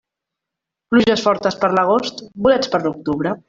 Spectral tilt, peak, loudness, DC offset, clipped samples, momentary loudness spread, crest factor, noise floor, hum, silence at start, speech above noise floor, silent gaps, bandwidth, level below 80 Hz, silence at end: -5.5 dB/octave; -2 dBFS; -17 LUFS; under 0.1%; under 0.1%; 7 LU; 16 dB; -83 dBFS; none; 0.9 s; 66 dB; none; 7.6 kHz; -54 dBFS; 0.1 s